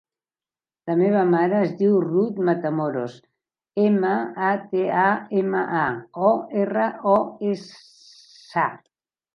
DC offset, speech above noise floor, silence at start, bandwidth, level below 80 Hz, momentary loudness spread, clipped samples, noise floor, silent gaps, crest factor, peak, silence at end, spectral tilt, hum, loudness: under 0.1%; over 69 dB; 0.85 s; 6.8 kHz; -68 dBFS; 8 LU; under 0.1%; under -90 dBFS; none; 18 dB; -4 dBFS; 0.6 s; -8.5 dB/octave; none; -22 LUFS